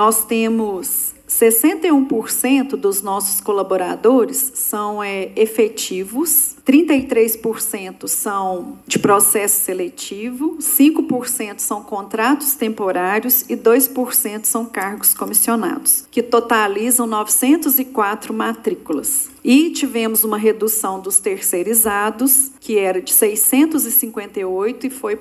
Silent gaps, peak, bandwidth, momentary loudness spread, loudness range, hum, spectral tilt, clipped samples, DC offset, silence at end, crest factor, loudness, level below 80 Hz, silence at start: none; 0 dBFS; 15.5 kHz; 9 LU; 3 LU; none; -2.5 dB/octave; under 0.1%; under 0.1%; 0 s; 16 dB; -16 LUFS; -60 dBFS; 0 s